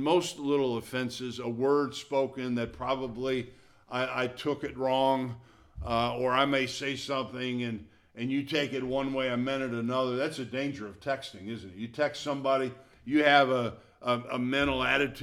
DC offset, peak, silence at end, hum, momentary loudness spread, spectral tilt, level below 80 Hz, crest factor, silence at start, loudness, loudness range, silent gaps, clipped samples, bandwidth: under 0.1%; -8 dBFS; 0 s; none; 11 LU; -5 dB/octave; -56 dBFS; 22 dB; 0 s; -30 LUFS; 4 LU; none; under 0.1%; 15 kHz